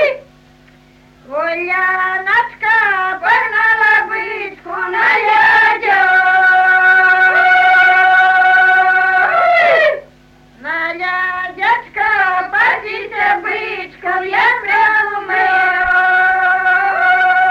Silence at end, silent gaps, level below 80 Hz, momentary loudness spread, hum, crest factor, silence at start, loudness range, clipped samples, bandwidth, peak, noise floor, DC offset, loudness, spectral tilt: 0 s; none; -52 dBFS; 11 LU; none; 10 dB; 0 s; 6 LU; under 0.1%; 13 kHz; -2 dBFS; -45 dBFS; under 0.1%; -11 LUFS; -3 dB/octave